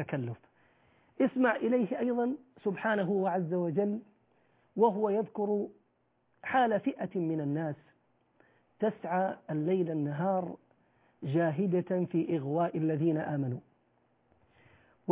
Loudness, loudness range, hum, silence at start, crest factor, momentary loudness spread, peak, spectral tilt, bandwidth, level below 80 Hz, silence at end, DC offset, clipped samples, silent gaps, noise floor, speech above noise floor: -32 LUFS; 3 LU; none; 0 s; 18 dB; 12 LU; -14 dBFS; -7 dB/octave; 4 kHz; -76 dBFS; 0 s; under 0.1%; under 0.1%; none; -74 dBFS; 43 dB